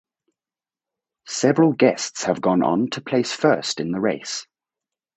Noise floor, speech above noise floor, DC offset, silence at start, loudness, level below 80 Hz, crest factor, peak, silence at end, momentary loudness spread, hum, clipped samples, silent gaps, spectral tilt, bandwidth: under -90 dBFS; over 70 dB; under 0.1%; 1.25 s; -21 LUFS; -64 dBFS; 20 dB; -2 dBFS; 0.75 s; 10 LU; none; under 0.1%; none; -4.5 dB/octave; 8.4 kHz